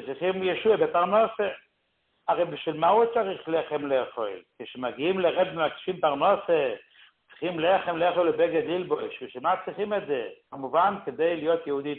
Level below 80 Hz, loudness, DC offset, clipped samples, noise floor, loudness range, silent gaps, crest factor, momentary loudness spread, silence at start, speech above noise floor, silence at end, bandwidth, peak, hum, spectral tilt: -68 dBFS; -26 LUFS; under 0.1%; under 0.1%; -73 dBFS; 2 LU; none; 16 dB; 11 LU; 0 s; 47 dB; 0 s; 4.3 kHz; -10 dBFS; none; -9.5 dB/octave